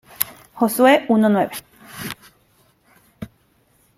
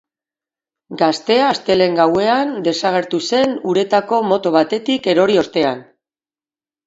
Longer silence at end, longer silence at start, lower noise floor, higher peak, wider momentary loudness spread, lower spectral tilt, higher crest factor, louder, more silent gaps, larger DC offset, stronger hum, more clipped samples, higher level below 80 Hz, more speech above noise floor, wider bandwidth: second, 0.75 s vs 1.05 s; second, 0.2 s vs 0.9 s; second, -60 dBFS vs under -90 dBFS; about the same, 0 dBFS vs 0 dBFS; first, 24 LU vs 5 LU; about the same, -4.5 dB/octave vs -5 dB/octave; first, 22 dB vs 16 dB; about the same, -17 LUFS vs -16 LUFS; neither; neither; neither; neither; about the same, -60 dBFS vs -60 dBFS; second, 44 dB vs over 75 dB; first, 16.5 kHz vs 8 kHz